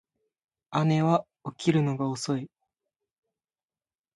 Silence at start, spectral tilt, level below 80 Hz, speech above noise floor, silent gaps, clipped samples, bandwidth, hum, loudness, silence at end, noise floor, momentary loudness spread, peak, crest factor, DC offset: 0.7 s; -6.5 dB/octave; -70 dBFS; over 64 dB; none; under 0.1%; 11.5 kHz; none; -27 LUFS; 1.7 s; under -90 dBFS; 9 LU; -10 dBFS; 20 dB; under 0.1%